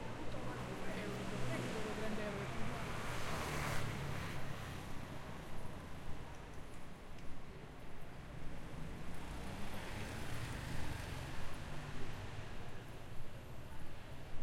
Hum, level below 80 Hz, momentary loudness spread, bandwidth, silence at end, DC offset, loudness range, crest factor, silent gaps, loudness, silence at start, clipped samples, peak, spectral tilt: none; -52 dBFS; 12 LU; 16 kHz; 0 s; under 0.1%; 9 LU; 18 dB; none; -46 LUFS; 0 s; under 0.1%; -22 dBFS; -5 dB/octave